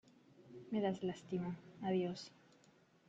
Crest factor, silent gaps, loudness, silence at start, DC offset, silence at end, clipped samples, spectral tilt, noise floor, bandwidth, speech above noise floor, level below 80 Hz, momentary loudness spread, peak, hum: 18 dB; none; -42 LUFS; 0.4 s; under 0.1%; 0.8 s; under 0.1%; -7 dB/octave; -70 dBFS; 8 kHz; 29 dB; -80 dBFS; 18 LU; -26 dBFS; none